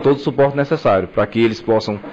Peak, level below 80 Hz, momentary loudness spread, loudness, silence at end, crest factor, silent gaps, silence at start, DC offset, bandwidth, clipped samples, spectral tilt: -6 dBFS; -48 dBFS; 3 LU; -17 LUFS; 0 s; 10 dB; none; 0 s; under 0.1%; 7.8 kHz; under 0.1%; -7.5 dB/octave